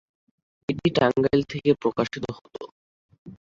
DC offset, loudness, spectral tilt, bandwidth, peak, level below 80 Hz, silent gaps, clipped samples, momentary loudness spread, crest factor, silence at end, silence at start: under 0.1%; -24 LUFS; -7 dB/octave; 7.6 kHz; -6 dBFS; -56 dBFS; 2.72-3.09 s, 3.18-3.26 s; under 0.1%; 19 LU; 20 dB; 0.05 s; 0.7 s